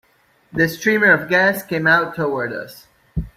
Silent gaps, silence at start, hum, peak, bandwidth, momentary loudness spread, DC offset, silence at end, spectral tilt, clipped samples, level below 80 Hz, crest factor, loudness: none; 0.55 s; none; -2 dBFS; 16 kHz; 16 LU; under 0.1%; 0.1 s; -5.5 dB/octave; under 0.1%; -42 dBFS; 16 dB; -17 LUFS